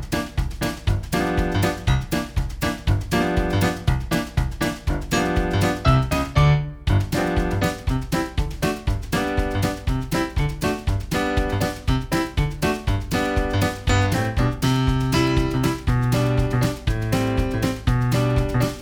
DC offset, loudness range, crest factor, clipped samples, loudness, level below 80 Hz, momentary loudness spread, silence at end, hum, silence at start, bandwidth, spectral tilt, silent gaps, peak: under 0.1%; 3 LU; 18 dB; under 0.1%; -22 LUFS; -28 dBFS; 5 LU; 0 s; none; 0 s; over 20 kHz; -6 dB/octave; none; -4 dBFS